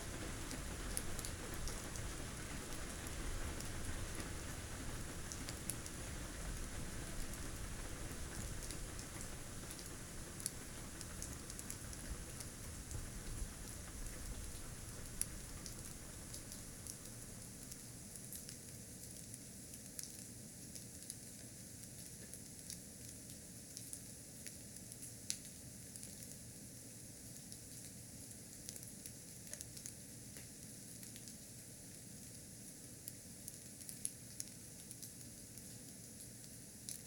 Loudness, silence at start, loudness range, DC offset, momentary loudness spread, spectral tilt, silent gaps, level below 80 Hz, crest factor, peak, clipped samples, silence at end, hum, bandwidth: -49 LUFS; 0 s; 4 LU; under 0.1%; 7 LU; -3 dB/octave; none; -54 dBFS; 32 dB; -16 dBFS; under 0.1%; 0 s; none; 19 kHz